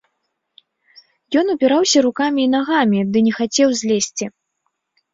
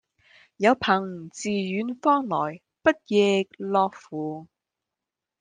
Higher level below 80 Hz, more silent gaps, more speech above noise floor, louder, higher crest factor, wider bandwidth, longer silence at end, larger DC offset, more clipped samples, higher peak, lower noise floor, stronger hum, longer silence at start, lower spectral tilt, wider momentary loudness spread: first, -62 dBFS vs -68 dBFS; neither; second, 57 dB vs 63 dB; first, -17 LUFS vs -25 LUFS; second, 16 dB vs 22 dB; second, 7.8 kHz vs 9.8 kHz; about the same, 0.85 s vs 0.95 s; neither; neither; about the same, -2 dBFS vs -4 dBFS; second, -73 dBFS vs -87 dBFS; neither; first, 1.3 s vs 0.6 s; about the same, -4 dB/octave vs -5 dB/octave; second, 6 LU vs 12 LU